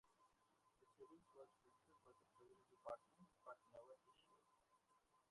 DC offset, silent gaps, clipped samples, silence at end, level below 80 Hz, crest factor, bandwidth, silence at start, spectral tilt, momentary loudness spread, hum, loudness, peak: under 0.1%; none; under 0.1%; 0 s; under -90 dBFS; 24 dB; 11 kHz; 0.05 s; -5 dB/octave; 11 LU; none; -63 LUFS; -42 dBFS